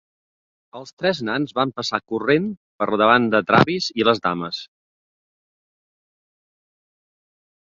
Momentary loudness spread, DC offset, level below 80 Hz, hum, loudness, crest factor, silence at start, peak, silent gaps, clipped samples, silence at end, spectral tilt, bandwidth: 14 LU; under 0.1%; -60 dBFS; none; -20 LUFS; 22 dB; 0.75 s; 0 dBFS; 0.93-0.97 s, 2.57-2.79 s; under 0.1%; 3 s; -5.5 dB/octave; 7.6 kHz